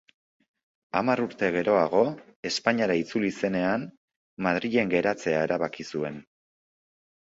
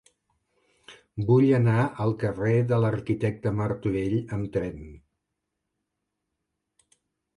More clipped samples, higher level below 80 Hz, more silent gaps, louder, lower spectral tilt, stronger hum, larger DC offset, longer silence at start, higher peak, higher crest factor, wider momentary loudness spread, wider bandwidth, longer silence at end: neither; second, -64 dBFS vs -52 dBFS; first, 2.36-2.43 s, 3.97-4.08 s, 4.16-4.37 s vs none; about the same, -26 LUFS vs -25 LUFS; second, -5.5 dB/octave vs -9 dB/octave; neither; neither; about the same, 0.95 s vs 0.9 s; first, -6 dBFS vs -10 dBFS; about the same, 22 dB vs 18 dB; about the same, 9 LU vs 11 LU; second, 8 kHz vs 10.5 kHz; second, 1.15 s vs 2.4 s